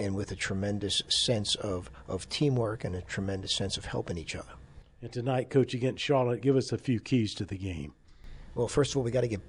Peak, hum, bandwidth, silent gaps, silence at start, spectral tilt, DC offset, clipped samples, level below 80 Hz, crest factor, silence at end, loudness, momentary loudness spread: -12 dBFS; none; 11 kHz; none; 0 s; -5 dB/octave; under 0.1%; under 0.1%; -52 dBFS; 18 dB; 0 s; -30 LUFS; 12 LU